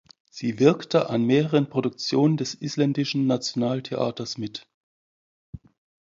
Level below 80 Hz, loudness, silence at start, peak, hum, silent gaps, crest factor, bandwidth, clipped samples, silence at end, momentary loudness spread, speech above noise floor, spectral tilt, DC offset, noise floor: -62 dBFS; -24 LUFS; 0.35 s; -4 dBFS; none; 4.74-5.53 s; 20 dB; 7.8 kHz; under 0.1%; 0.45 s; 11 LU; over 67 dB; -6 dB/octave; under 0.1%; under -90 dBFS